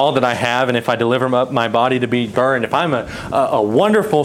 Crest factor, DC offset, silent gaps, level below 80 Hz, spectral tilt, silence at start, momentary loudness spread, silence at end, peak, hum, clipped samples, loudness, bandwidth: 14 dB; under 0.1%; none; -50 dBFS; -6 dB/octave; 0 s; 4 LU; 0 s; -2 dBFS; none; under 0.1%; -16 LUFS; 16 kHz